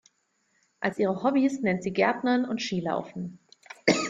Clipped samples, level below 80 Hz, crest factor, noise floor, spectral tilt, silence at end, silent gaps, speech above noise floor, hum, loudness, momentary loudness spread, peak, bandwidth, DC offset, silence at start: under 0.1%; -66 dBFS; 22 dB; -72 dBFS; -5 dB/octave; 0 s; none; 46 dB; none; -27 LUFS; 14 LU; -6 dBFS; 9.4 kHz; under 0.1%; 0.8 s